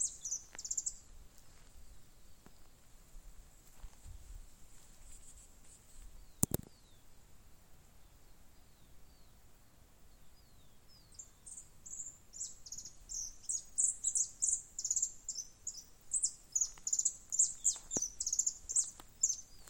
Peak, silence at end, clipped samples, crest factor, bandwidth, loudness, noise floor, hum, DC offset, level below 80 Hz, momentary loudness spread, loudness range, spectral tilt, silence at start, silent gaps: -6 dBFS; 0 s; under 0.1%; 36 dB; 17 kHz; -36 LUFS; -61 dBFS; none; under 0.1%; -60 dBFS; 24 LU; 24 LU; -1.5 dB/octave; 0 s; none